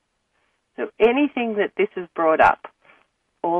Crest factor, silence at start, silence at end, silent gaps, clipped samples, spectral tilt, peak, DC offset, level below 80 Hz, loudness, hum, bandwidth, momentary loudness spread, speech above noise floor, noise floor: 18 dB; 0.8 s; 0 s; none; under 0.1%; -6.5 dB/octave; -4 dBFS; under 0.1%; -60 dBFS; -21 LUFS; none; 7.8 kHz; 14 LU; 50 dB; -69 dBFS